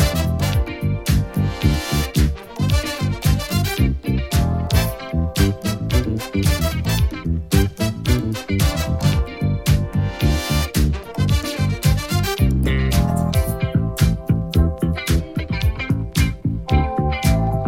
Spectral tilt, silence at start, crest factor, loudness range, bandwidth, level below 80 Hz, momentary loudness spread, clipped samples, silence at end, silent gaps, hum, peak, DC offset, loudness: -5.5 dB/octave; 0 s; 16 dB; 1 LU; 17 kHz; -24 dBFS; 4 LU; under 0.1%; 0 s; none; none; -2 dBFS; under 0.1%; -20 LUFS